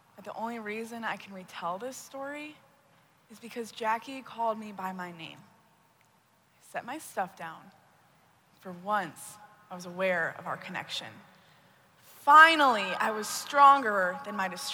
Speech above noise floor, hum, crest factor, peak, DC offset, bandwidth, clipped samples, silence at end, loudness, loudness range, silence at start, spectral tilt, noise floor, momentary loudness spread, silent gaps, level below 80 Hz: 37 dB; none; 26 dB; -4 dBFS; under 0.1%; over 20 kHz; under 0.1%; 0 s; -27 LUFS; 18 LU; 0.2 s; -2.5 dB/octave; -66 dBFS; 24 LU; none; -82 dBFS